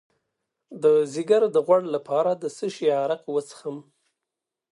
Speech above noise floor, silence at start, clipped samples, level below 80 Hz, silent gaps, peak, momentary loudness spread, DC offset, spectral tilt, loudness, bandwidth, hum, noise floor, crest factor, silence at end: 63 dB; 0.7 s; under 0.1%; -80 dBFS; none; -6 dBFS; 14 LU; under 0.1%; -5.5 dB/octave; -23 LUFS; 11.5 kHz; none; -86 dBFS; 18 dB; 0.95 s